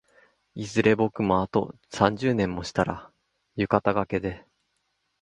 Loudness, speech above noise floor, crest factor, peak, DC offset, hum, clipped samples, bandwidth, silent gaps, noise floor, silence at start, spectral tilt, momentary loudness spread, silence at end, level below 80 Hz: -25 LUFS; 50 dB; 24 dB; -2 dBFS; under 0.1%; none; under 0.1%; 11 kHz; none; -75 dBFS; 0.55 s; -6.5 dB/octave; 15 LU; 0.8 s; -52 dBFS